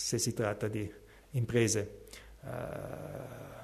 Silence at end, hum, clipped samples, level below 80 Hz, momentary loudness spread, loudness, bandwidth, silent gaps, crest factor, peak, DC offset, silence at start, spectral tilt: 0 s; none; under 0.1%; -58 dBFS; 16 LU; -35 LUFS; 13.5 kHz; none; 20 dB; -16 dBFS; under 0.1%; 0 s; -4.5 dB/octave